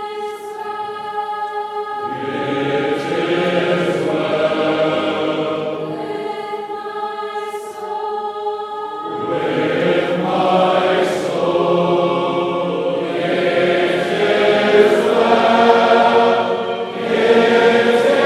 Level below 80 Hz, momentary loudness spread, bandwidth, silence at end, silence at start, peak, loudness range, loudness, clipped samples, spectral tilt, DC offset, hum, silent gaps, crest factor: -64 dBFS; 13 LU; 13 kHz; 0 s; 0 s; 0 dBFS; 10 LU; -17 LUFS; under 0.1%; -5.5 dB/octave; under 0.1%; none; none; 16 dB